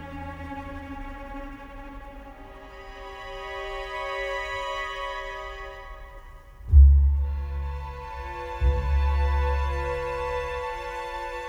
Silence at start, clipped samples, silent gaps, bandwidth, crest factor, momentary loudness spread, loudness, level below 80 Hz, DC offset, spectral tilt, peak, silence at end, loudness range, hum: 0 s; under 0.1%; none; 7.2 kHz; 20 dB; 20 LU; -27 LUFS; -26 dBFS; under 0.1%; -6.5 dB/octave; -6 dBFS; 0 s; 15 LU; none